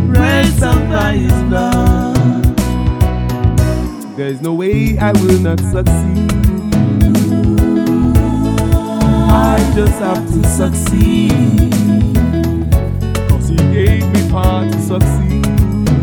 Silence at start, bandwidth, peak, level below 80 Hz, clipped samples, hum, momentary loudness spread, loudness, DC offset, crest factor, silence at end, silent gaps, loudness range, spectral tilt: 0 s; 19 kHz; 0 dBFS; -18 dBFS; under 0.1%; none; 4 LU; -13 LUFS; under 0.1%; 12 dB; 0 s; none; 2 LU; -7 dB/octave